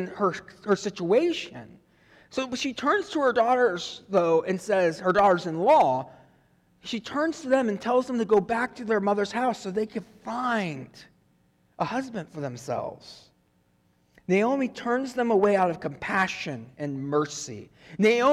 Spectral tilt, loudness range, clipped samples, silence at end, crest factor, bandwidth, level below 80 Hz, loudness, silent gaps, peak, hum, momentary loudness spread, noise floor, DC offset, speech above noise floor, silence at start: -5 dB/octave; 9 LU; under 0.1%; 0 s; 14 dB; 13 kHz; -64 dBFS; -26 LUFS; none; -12 dBFS; none; 14 LU; -66 dBFS; under 0.1%; 41 dB; 0 s